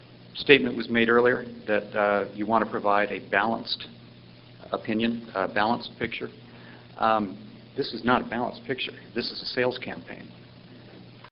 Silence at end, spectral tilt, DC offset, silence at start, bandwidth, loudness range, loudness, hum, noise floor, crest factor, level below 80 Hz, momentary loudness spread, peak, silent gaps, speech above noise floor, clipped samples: 0.05 s; -2.5 dB/octave; under 0.1%; 0 s; 5.8 kHz; 6 LU; -26 LUFS; none; -49 dBFS; 26 dB; -60 dBFS; 19 LU; 0 dBFS; none; 23 dB; under 0.1%